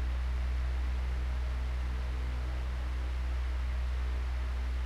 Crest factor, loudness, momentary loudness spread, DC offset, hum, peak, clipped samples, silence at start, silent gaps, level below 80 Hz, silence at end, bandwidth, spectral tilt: 6 dB; -36 LUFS; 2 LU; under 0.1%; none; -26 dBFS; under 0.1%; 0 s; none; -32 dBFS; 0 s; 7 kHz; -6.5 dB/octave